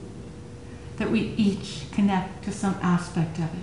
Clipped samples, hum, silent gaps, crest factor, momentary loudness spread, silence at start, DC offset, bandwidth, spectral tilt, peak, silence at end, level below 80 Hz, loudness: under 0.1%; none; none; 16 dB; 17 LU; 0 s; 0.3%; 11 kHz; -6.5 dB/octave; -12 dBFS; 0 s; -48 dBFS; -26 LUFS